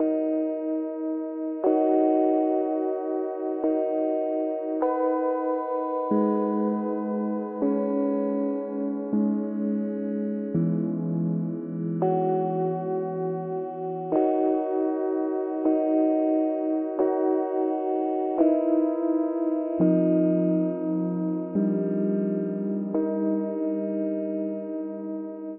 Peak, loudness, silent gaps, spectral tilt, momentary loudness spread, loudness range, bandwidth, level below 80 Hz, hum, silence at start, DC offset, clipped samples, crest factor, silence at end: -8 dBFS; -26 LUFS; none; -10.5 dB/octave; 7 LU; 3 LU; 3.1 kHz; -74 dBFS; none; 0 s; under 0.1%; under 0.1%; 16 dB; 0 s